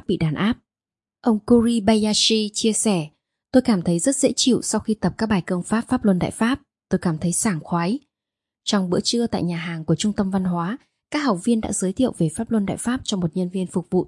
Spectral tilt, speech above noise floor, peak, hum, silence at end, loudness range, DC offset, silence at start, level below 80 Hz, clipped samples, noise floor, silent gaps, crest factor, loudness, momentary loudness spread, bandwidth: -4.5 dB/octave; over 69 dB; -2 dBFS; none; 0 s; 4 LU; under 0.1%; 0.1 s; -50 dBFS; under 0.1%; under -90 dBFS; none; 18 dB; -21 LUFS; 8 LU; 11.5 kHz